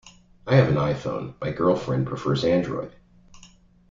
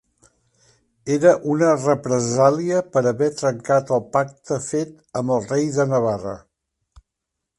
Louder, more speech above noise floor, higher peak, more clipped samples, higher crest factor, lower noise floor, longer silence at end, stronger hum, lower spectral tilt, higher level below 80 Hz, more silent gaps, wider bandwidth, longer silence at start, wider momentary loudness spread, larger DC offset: second, -24 LUFS vs -20 LUFS; second, 29 dB vs 62 dB; about the same, -4 dBFS vs -2 dBFS; neither; about the same, 20 dB vs 20 dB; second, -52 dBFS vs -81 dBFS; second, 0.45 s vs 1.2 s; neither; first, -7.5 dB/octave vs -6 dB/octave; first, -52 dBFS vs -58 dBFS; neither; second, 7.6 kHz vs 11.5 kHz; second, 0.05 s vs 1.05 s; about the same, 12 LU vs 10 LU; neither